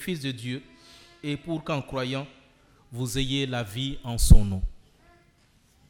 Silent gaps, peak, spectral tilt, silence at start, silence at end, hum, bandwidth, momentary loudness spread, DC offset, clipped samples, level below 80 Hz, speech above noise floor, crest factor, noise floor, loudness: none; -2 dBFS; -5 dB/octave; 0 s; 1.15 s; none; 16.5 kHz; 18 LU; under 0.1%; under 0.1%; -28 dBFS; 39 dB; 24 dB; -62 dBFS; -28 LUFS